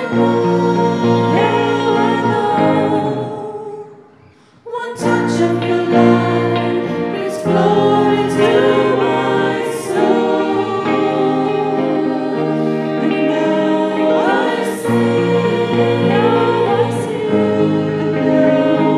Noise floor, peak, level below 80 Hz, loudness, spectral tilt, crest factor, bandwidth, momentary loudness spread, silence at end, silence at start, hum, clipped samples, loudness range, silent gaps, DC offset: -47 dBFS; 0 dBFS; -58 dBFS; -15 LUFS; -7 dB/octave; 14 dB; 13.5 kHz; 6 LU; 0 s; 0 s; none; under 0.1%; 3 LU; none; under 0.1%